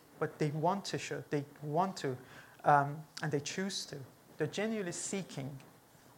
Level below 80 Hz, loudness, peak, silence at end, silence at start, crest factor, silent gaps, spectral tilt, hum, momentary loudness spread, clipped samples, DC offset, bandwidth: -78 dBFS; -36 LUFS; -14 dBFS; 0.5 s; 0.1 s; 24 dB; none; -4.5 dB/octave; none; 16 LU; under 0.1%; under 0.1%; 17 kHz